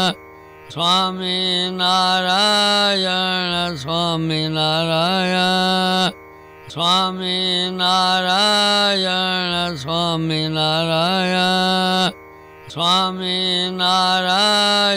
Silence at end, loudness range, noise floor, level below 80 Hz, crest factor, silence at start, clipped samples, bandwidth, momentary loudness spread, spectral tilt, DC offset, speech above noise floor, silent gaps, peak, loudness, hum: 0 s; 2 LU; -41 dBFS; -54 dBFS; 14 dB; 0 s; under 0.1%; 16 kHz; 7 LU; -3.5 dB/octave; under 0.1%; 23 dB; none; -4 dBFS; -17 LUFS; 50 Hz at -55 dBFS